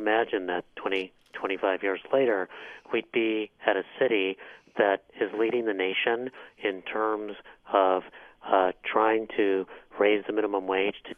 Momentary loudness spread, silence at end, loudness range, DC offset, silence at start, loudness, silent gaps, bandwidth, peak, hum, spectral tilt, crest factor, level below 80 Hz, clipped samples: 10 LU; 0.05 s; 2 LU; under 0.1%; 0 s; -27 LUFS; none; 5.2 kHz; -6 dBFS; none; -6.5 dB/octave; 20 dB; -70 dBFS; under 0.1%